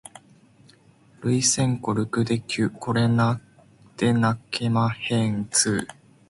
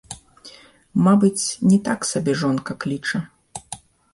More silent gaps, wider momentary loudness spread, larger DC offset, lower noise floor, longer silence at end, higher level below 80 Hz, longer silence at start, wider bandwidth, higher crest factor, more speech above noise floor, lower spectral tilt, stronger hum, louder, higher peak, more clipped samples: neither; second, 6 LU vs 21 LU; neither; first, -55 dBFS vs -46 dBFS; about the same, 0.35 s vs 0.35 s; about the same, -56 dBFS vs -56 dBFS; first, 1.2 s vs 0.1 s; about the same, 11.5 kHz vs 11.5 kHz; about the same, 18 dB vs 16 dB; first, 32 dB vs 27 dB; about the same, -4.5 dB/octave vs -5.5 dB/octave; neither; second, -23 LUFS vs -20 LUFS; about the same, -6 dBFS vs -4 dBFS; neither